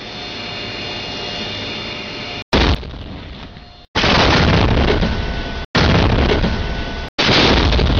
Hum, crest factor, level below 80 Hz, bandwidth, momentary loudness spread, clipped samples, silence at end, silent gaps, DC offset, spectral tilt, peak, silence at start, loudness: none; 14 dB; -24 dBFS; 7.2 kHz; 14 LU; under 0.1%; 0 s; 2.42-2.52 s, 3.88-3.94 s, 5.65-5.74 s, 7.09-7.18 s; under 0.1%; -5.5 dB/octave; -2 dBFS; 0 s; -17 LUFS